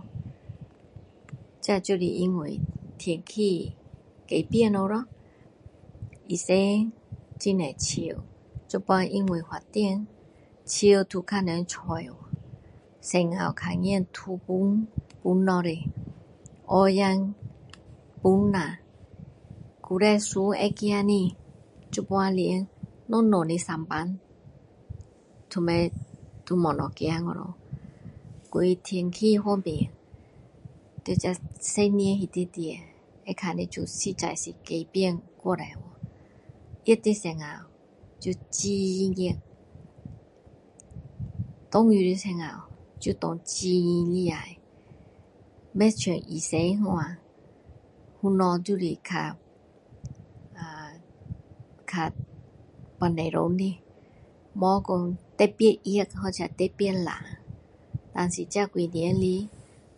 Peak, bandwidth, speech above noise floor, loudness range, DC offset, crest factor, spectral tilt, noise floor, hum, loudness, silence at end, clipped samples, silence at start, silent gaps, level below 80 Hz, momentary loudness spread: -6 dBFS; 11.5 kHz; 31 dB; 5 LU; under 0.1%; 22 dB; -5.5 dB/octave; -57 dBFS; none; -27 LUFS; 0.35 s; under 0.1%; 0.05 s; none; -52 dBFS; 22 LU